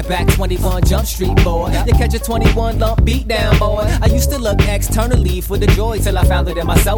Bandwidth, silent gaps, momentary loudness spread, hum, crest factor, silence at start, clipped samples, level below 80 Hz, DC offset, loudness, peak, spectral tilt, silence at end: 20 kHz; none; 3 LU; none; 14 dB; 0 s; under 0.1%; -16 dBFS; under 0.1%; -15 LUFS; 0 dBFS; -5.5 dB/octave; 0 s